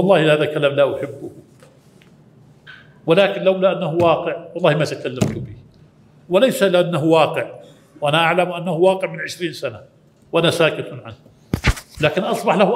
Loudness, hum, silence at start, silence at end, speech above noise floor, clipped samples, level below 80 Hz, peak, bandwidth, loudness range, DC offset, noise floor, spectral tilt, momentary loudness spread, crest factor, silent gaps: -18 LUFS; none; 0 s; 0 s; 32 dB; under 0.1%; -38 dBFS; 0 dBFS; 16 kHz; 3 LU; under 0.1%; -49 dBFS; -5.5 dB/octave; 14 LU; 18 dB; none